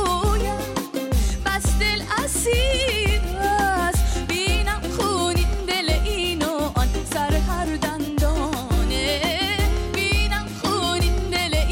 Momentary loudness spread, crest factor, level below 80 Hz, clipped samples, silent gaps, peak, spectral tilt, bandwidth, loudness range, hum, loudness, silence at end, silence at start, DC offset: 4 LU; 10 dB; -24 dBFS; under 0.1%; none; -10 dBFS; -4 dB/octave; 17 kHz; 2 LU; none; -22 LUFS; 0 s; 0 s; under 0.1%